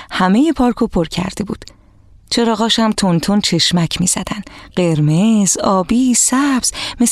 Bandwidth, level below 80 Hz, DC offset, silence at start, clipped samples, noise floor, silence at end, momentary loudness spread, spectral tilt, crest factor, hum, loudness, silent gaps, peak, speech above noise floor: 14.5 kHz; -40 dBFS; under 0.1%; 0 s; under 0.1%; -45 dBFS; 0 s; 9 LU; -4 dB/octave; 12 dB; none; -14 LUFS; none; -2 dBFS; 31 dB